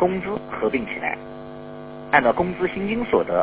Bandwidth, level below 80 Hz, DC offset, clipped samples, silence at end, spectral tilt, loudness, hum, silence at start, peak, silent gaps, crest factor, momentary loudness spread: 4 kHz; -50 dBFS; under 0.1%; under 0.1%; 0 s; -9.5 dB/octave; -23 LUFS; none; 0 s; 0 dBFS; none; 22 dB; 19 LU